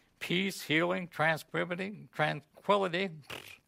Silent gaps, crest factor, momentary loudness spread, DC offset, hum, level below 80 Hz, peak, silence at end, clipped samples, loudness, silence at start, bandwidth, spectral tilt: none; 20 dB; 9 LU; under 0.1%; none; -74 dBFS; -14 dBFS; 0.15 s; under 0.1%; -32 LUFS; 0.2 s; 16 kHz; -5 dB/octave